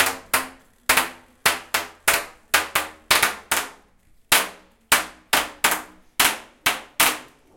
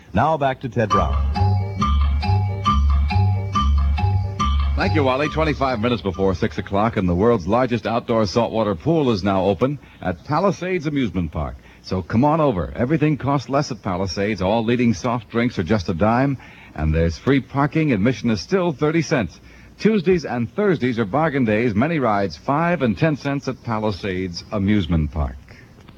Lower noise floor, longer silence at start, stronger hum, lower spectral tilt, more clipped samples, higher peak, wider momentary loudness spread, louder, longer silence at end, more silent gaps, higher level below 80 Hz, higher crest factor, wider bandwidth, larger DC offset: first, -56 dBFS vs -44 dBFS; second, 0 s vs 0.15 s; neither; second, 0.5 dB/octave vs -7 dB/octave; neither; first, 0 dBFS vs -4 dBFS; first, 9 LU vs 6 LU; about the same, -21 LUFS vs -20 LUFS; second, 0.3 s vs 0.45 s; neither; second, -52 dBFS vs -28 dBFS; first, 24 dB vs 16 dB; first, 17.5 kHz vs 7.6 kHz; neither